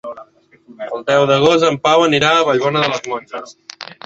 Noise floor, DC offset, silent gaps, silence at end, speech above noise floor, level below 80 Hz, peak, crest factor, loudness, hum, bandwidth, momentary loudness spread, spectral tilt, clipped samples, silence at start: -46 dBFS; under 0.1%; none; 0.1 s; 31 dB; -56 dBFS; -2 dBFS; 14 dB; -14 LUFS; none; 8 kHz; 20 LU; -4.5 dB/octave; under 0.1%; 0.05 s